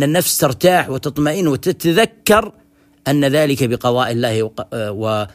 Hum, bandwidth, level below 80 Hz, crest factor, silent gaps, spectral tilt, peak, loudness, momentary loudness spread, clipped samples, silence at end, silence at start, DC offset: none; 15.5 kHz; -48 dBFS; 16 dB; none; -4.5 dB/octave; 0 dBFS; -16 LUFS; 8 LU; under 0.1%; 0.05 s; 0 s; under 0.1%